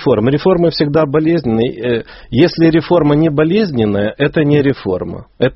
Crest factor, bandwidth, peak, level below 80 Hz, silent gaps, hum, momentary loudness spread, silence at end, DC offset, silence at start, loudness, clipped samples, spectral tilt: 12 dB; 6 kHz; 0 dBFS; -40 dBFS; none; none; 8 LU; 0 s; under 0.1%; 0 s; -13 LUFS; under 0.1%; -6 dB/octave